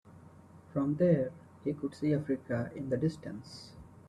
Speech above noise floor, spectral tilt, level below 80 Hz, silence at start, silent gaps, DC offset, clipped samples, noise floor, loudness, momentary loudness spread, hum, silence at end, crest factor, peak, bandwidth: 23 dB; -8.5 dB/octave; -66 dBFS; 0.05 s; none; under 0.1%; under 0.1%; -55 dBFS; -33 LUFS; 17 LU; none; 0.15 s; 20 dB; -14 dBFS; 11.5 kHz